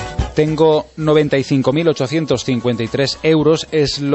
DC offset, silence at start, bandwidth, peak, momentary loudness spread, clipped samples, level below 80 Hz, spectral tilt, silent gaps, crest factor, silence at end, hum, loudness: under 0.1%; 0 s; 8.4 kHz; -2 dBFS; 5 LU; under 0.1%; -36 dBFS; -6 dB/octave; none; 14 dB; 0 s; none; -16 LUFS